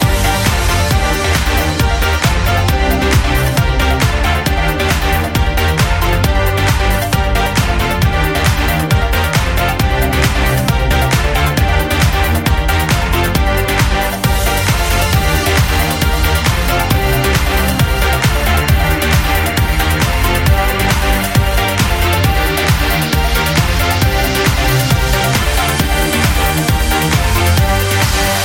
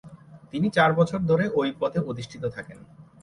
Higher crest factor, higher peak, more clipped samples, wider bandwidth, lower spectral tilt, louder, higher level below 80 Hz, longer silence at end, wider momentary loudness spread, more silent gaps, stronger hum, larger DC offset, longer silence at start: second, 12 dB vs 18 dB; first, 0 dBFS vs -8 dBFS; neither; first, 17 kHz vs 11 kHz; second, -4.5 dB/octave vs -7 dB/octave; first, -13 LUFS vs -24 LUFS; first, -18 dBFS vs -58 dBFS; second, 0 s vs 0.2 s; second, 2 LU vs 14 LU; neither; neither; neither; about the same, 0 s vs 0.05 s